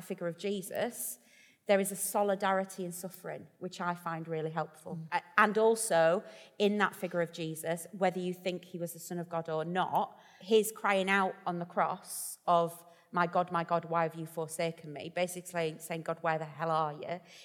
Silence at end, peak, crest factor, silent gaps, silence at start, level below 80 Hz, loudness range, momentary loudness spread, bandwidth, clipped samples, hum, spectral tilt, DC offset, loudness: 0 s; -10 dBFS; 24 dB; none; 0 s; -80 dBFS; 5 LU; 13 LU; 19 kHz; under 0.1%; none; -4.5 dB/octave; under 0.1%; -33 LUFS